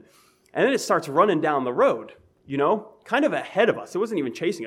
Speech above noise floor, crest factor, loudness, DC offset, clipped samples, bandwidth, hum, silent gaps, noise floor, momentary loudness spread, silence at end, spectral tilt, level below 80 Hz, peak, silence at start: 35 dB; 18 dB; -23 LUFS; under 0.1%; under 0.1%; 16 kHz; none; none; -58 dBFS; 7 LU; 0 s; -5 dB/octave; -74 dBFS; -6 dBFS; 0.55 s